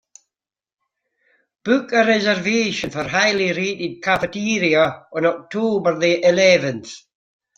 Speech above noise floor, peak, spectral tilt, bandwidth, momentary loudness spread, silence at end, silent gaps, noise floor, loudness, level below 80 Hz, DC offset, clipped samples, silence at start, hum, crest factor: 67 dB; -2 dBFS; -4 dB/octave; 7.8 kHz; 9 LU; 0.6 s; none; -86 dBFS; -18 LUFS; -58 dBFS; under 0.1%; under 0.1%; 1.65 s; none; 18 dB